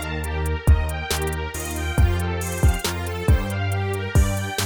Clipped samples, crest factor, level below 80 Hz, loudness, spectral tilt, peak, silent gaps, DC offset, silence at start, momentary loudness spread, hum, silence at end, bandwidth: under 0.1%; 14 dB; -24 dBFS; -23 LUFS; -5 dB/octave; -6 dBFS; none; under 0.1%; 0 s; 6 LU; none; 0 s; over 20 kHz